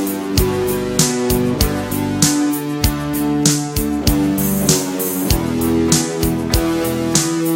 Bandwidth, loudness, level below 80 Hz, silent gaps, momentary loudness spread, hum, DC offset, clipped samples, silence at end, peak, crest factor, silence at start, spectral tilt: 16.5 kHz; -17 LUFS; -28 dBFS; none; 4 LU; none; under 0.1%; under 0.1%; 0 s; 0 dBFS; 16 dB; 0 s; -4.5 dB/octave